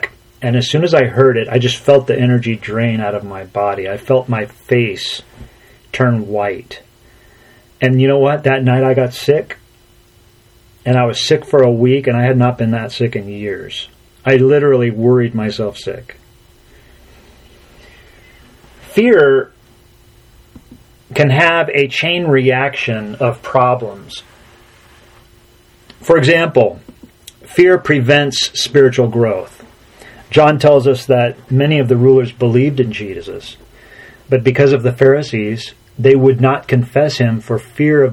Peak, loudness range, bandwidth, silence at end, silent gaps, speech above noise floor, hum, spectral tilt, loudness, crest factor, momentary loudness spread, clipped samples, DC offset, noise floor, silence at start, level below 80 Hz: 0 dBFS; 6 LU; 14.5 kHz; 0 s; none; 35 dB; none; -6.5 dB/octave; -13 LUFS; 14 dB; 14 LU; under 0.1%; under 0.1%; -48 dBFS; 0.05 s; -48 dBFS